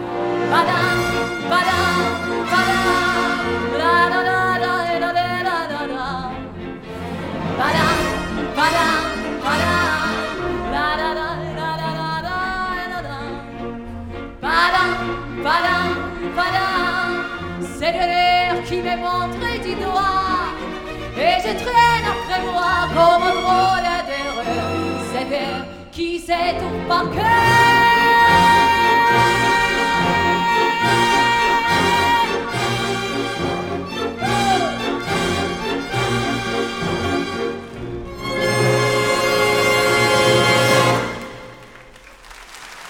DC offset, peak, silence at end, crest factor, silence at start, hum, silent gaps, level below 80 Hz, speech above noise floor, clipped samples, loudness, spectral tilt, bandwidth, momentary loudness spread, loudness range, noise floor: under 0.1%; -2 dBFS; 0 s; 16 dB; 0 s; none; none; -40 dBFS; 26 dB; under 0.1%; -18 LUFS; -4 dB/octave; 18 kHz; 13 LU; 8 LU; -42 dBFS